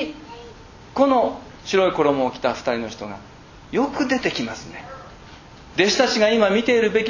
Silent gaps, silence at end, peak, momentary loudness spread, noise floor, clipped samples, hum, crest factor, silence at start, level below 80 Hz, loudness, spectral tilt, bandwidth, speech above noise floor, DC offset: none; 0 s; -2 dBFS; 21 LU; -43 dBFS; under 0.1%; none; 20 dB; 0 s; -50 dBFS; -20 LUFS; -4 dB/octave; 7.4 kHz; 23 dB; under 0.1%